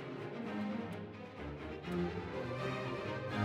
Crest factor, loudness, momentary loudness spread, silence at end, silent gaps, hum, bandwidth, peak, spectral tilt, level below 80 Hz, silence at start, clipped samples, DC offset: 18 dB; -42 LUFS; 7 LU; 0 s; none; none; 13 kHz; -22 dBFS; -7 dB/octave; -60 dBFS; 0 s; under 0.1%; under 0.1%